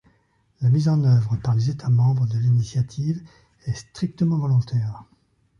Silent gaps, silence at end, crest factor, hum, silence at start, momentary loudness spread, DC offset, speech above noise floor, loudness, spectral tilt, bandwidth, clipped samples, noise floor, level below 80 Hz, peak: none; 0.55 s; 12 dB; none; 0.6 s; 12 LU; under 0.1%; 43 dB; -22 LUFS; -8 dB/octave; 7.2 kHz; under 0.1%; -64 dBFS; -52 dBFS; -8 dBFS